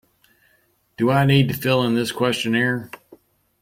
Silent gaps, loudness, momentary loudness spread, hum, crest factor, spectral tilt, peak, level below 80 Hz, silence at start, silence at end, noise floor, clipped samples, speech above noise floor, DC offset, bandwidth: none; -20 LUFS; 7 LU; none; 18 dB; -6 dB/octave; -4 dBFS; -56 dBFS; 1 s; 0.65 s; -63 dBFS; under 0.1%; 44 dB; under 0.1%; 16.5 kHz